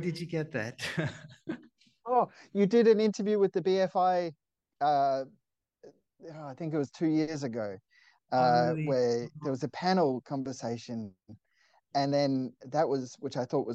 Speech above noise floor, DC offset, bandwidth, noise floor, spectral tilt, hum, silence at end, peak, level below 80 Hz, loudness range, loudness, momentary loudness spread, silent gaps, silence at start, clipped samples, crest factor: 40 dB; under 0.1%; 11.5 kHz; -69 dBFS; -6.5 dB/octave; none; 0 s; -12 dBFS; -74 dBFS; 5 LU; -30 LUFS; 16 LU; none; 0 s; under 0.1%; 18 dB